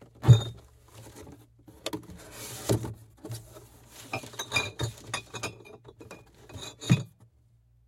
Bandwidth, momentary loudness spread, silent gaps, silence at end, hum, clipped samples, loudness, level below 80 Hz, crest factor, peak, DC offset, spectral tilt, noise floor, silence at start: 16 kHz; 26 LU; none; 0.8 s; none; under 0.1%; -29 LUFS; -52 dBFS; 26 dB; -6 dBFS; under 0.1%; -5.5 dB/octave; -63 dBFS; 0.2 s